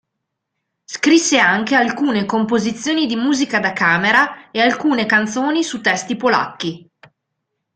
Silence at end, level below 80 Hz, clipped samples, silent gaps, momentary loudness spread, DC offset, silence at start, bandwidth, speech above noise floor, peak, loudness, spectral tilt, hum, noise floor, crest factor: 0.95 s; -60 dBFS; under 0.1%; none; 7 LU; under 0.1%; 0.9 s; 9.4 kHz; 61 dB; 0 dBFS; -16 LUFS; -3.5 dB/octave; none; -77 dBFS; 18 dB